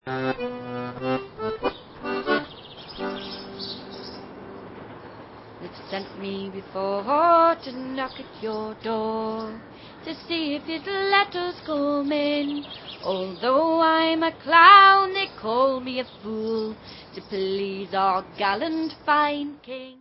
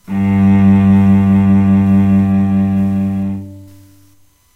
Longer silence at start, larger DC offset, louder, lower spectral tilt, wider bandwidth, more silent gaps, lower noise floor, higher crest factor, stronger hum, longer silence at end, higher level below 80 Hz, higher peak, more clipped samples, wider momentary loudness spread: about the same, 0.05 s vs 0.1 s; neither; second, -22 LUFS vs -11 LUFS; second, -8.5 dB/octave vs -10 dB/octave; first, 5.8 kHz vs 3.8 kHz; neither; second, -43 dBFS vs -50 dBFS; first, 24 dB vs 10 dB; neither; second, 0.05 s vs 0.9 s; second, -58 dBFS vs -40 dBFS; about the same, 0 dBFS vs -2 dBFS; neither; first, 21 LU vs 8 LU